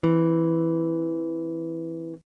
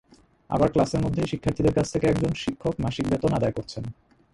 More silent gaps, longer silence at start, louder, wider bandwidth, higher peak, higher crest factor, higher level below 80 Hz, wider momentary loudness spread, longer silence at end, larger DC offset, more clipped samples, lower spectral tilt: neither; second, 0.05 s vs 0.5 s; about the same, -26 LUFS vs -25 LUFS; second, 3.9 kHz vs 11.5 kHz; second, -12 dBFS vs -6 dBFS; about the same, 14 dB vs 18 dB; second, -64 dBFS vs -44 dBFS; about the same, 11 LU vs 9 LU; second, 0.1 s vs 0.4 s; neither; neither; first, -10.5 dB/octave vs -7 dB/octave